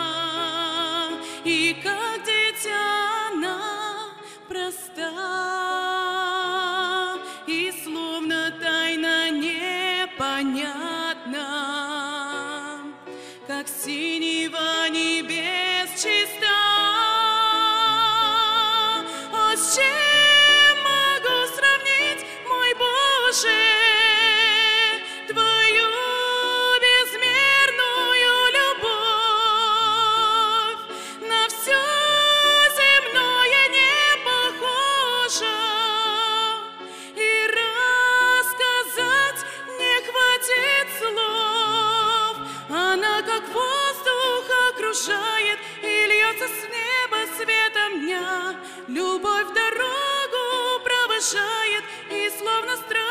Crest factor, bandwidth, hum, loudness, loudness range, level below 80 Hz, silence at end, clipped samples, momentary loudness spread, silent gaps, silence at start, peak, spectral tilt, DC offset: 18 dB; 15.5 kHz; none; -20 LUFS; 9 LU; -68 dBFS; 0 s; under 0.1%; 13 LU; none; 0 s; -4 dBFS; 0 dB/octave; 0.1%